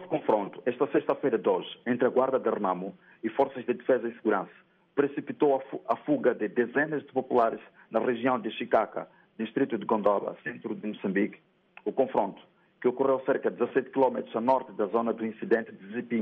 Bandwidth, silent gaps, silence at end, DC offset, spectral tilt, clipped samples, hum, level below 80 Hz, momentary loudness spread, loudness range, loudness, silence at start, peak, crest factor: 4.7 kHz; none; 0 s; under 0.1%; -5 dB/octave; under 0.1%; none; -76 dBFS; 9 LU; 2 LU; -29 LUFS; 0 s; -12 dBFS; 16 dB